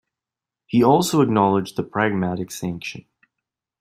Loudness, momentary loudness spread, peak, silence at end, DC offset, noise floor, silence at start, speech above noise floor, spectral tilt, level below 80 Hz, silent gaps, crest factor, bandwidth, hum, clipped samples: -20 LUFS; 14 LU; -2 dBFS; 0.8 s; under 0.1%; -88 dBFS; 0.7 s; 68 dB; -6 dB/octave; -58 dBFS; none; 18 dB; 16 kHz; none; under 0.1%